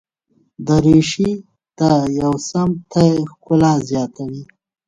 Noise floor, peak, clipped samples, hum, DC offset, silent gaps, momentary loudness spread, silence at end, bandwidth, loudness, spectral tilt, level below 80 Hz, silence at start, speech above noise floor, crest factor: -61 dBFS; 0 dBFS; under 0.1%; none; under 0.1%; none; 15 LU; 0.45 s; 9.6 kHz; -16 LUFS; -6.5 dB/octave; -44 dBFS; 0.6 s; 46 dB; 16 dB